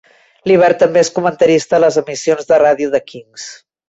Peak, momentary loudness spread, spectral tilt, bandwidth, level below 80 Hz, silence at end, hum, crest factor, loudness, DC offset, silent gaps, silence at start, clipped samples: -2 dBFS; 19 LU; -4.5 dB/octave; 8.2 kHz; -58 dBFS; 0.35 s; none; 12 dB; -13 LUFS; under 0.1%; none; 0.45 s; under 0.1%